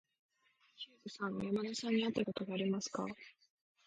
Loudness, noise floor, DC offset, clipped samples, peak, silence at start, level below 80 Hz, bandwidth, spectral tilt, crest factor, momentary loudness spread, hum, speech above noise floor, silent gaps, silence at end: -39 LUFS; -74 dBFS; under 0.1%; under 0.1%; -20 dBFS; 0.8 s; -76 dBFS; 9.4 kHz; -5 dB/octave; 20 dB; 16 LU; none; 35 dB; none; 0.55 s